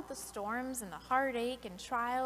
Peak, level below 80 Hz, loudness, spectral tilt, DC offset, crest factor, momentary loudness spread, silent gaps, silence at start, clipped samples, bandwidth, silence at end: -18 dBFS; -62 dBFS; -37 LUFS; -3 dB/octave; under 0.1%; 18 dB; 10 LU; none; 0 s; under 0.1%; 15.5 kHz; 0 s